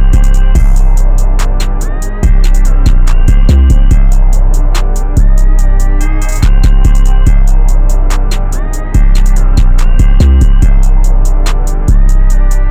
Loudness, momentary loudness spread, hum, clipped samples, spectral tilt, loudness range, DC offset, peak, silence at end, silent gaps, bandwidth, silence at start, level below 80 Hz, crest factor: -11 LUFS; 6 LU; none; 0.1%; -6 dB/octave; 1 LU; under 0.1%; 0 dBFS; 0 s; none; 9 kHz; 0 s; -4 dBFS; 4 dB